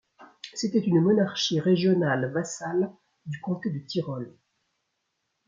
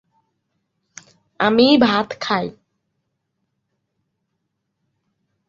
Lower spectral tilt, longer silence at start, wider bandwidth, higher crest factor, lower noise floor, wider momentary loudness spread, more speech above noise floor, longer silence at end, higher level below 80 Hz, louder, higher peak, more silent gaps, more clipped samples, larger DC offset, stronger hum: about the same, -5.5 dB/octave vs -5 dB/octave; second, 0.2 s vs 1.4 s; about the same, 7.6 kHz vs 7.6 kHz; about the same, 16 dB vs 20 dB; about the same, -78 dBFS vs -75 dBFS; first, 16 LU vs 10 LU; second, 53 dB vs 59 dB; second, 1.15 s vs 2.95 s; second, -70 dBFS vs -62 dBFS; second, -26 LUFS vs -17 LUFS; second, -12 dBFS vs -2 dBFS; neither; neither; neither; neither